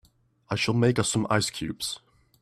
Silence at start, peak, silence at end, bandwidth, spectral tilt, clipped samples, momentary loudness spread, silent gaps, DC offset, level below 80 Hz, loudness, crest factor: 0.5 s; -8 dBFS; 0.45 s; 14.5 kHz; -4.5 dB/octave; under 0.1%; 10 LU; none; under 0.1%; -58 dBFS; -26 LUFS; 20 dB